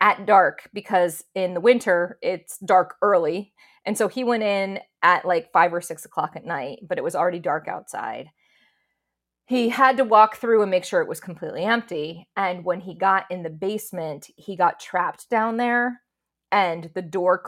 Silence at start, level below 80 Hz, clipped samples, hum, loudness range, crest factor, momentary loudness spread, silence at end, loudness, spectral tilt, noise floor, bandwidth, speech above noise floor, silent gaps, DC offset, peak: 0 s; -74 dBFS; under 0.1%; none; 5 LU; 20 dB; 14 LU; 0 s; -22 LUFS; -4.5 dB/octave; -82 dBFS; 16.5 kHz; 60 dB; none; under 0.1%; -2 dBFS